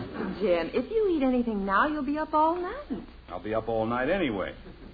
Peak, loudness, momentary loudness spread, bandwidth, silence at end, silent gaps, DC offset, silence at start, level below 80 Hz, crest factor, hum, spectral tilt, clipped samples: -12 dBFS; -28 LUFS; 13 LU; 5 kHz; 0 s; none; under 0.1%; 0 s; -48 dBFS; 16 dB; none; -9 dB/octave; under 0.1%